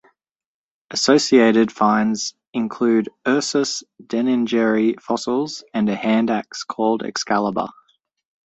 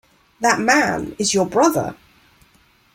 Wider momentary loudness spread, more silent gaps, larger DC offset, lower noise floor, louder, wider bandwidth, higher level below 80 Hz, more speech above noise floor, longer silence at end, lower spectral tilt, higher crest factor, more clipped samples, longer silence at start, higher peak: first, 11 LU vs 7 LU; first, 2.47-2.53 s vs none; neither; first, under -90 dBFS vs -56 dBFS; about the same, -19 LUFS vs -18 LUFS; second, 8.2 kHz vs 16.5 kHz; second, -64 dBFS vs -54 dBFS; first, over 71 dB vs 38 dB; second, 0.75 s vs 1 s; about the same, -4 dB/octave vs -3.5 dB/octave; about the same, 18 dB vs 20 dB; neither; first, 0.9 s vs 0.4 s; about the same, -2 dBFS vs 0 dBFS